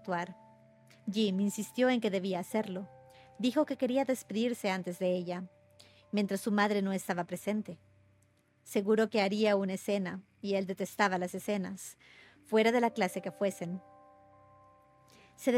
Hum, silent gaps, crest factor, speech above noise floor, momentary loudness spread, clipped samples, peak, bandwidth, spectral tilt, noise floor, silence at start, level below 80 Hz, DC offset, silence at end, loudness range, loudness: none; none; 20 dB; 37 dB; 13 LU; under 0.1%; -12 dBFS; 16.5 kHz; -5.5 dB/octave; -69 dBFS; 0.05 s; -80 dBFS; under 0.1%; 0 s; 2 LU; -33 LUFS